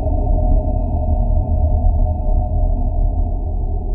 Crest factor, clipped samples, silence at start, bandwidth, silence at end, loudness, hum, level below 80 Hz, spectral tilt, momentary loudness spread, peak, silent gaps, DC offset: 12 dB; under 0.1%; 0 s; 1.1 kHz; 0 s; -20 LUFS; none; -16 dBFS; -14.5 dB/octave; 5 LU; -4 dBFS; none; under 0.1%